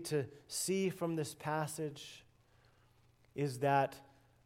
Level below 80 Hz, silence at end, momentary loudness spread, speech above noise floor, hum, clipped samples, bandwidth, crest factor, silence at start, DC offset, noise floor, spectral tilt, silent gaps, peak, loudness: -76 dBFS; 0.4 s; 18 LU; 31 dB; none; under 0.1%; 16 kHz; 20 dB; 0 s; under 0.1%; -68 dBFS; -5 dB/octave; none; -18 dBFS; -37 LUFS